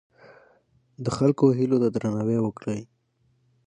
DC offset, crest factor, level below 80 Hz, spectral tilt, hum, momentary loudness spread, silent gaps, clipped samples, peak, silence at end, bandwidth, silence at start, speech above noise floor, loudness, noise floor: under 0.1%; 18 dB; -60 dBFS; -8 dB/octave; none; 12 LU; none; under 0.1%; -6 dBFS; 0.85 s; 10 kHz; 1 s; 45 dB; -24 LUFS; -68 dBFS